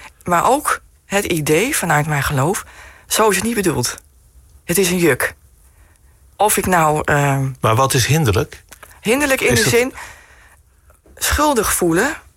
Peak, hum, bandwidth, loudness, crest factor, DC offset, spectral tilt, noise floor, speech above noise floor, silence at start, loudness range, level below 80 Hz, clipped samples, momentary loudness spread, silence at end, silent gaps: -4 dBFS; none; 16.5 kHz; -16 LUFS; 14 dB; under 0.1%; -4 dB/octave; -51 dBFS; 35 dB; 0 s; 3 LU; -38 dBFS; under 0.1%; 9 LU; 0.15 s; none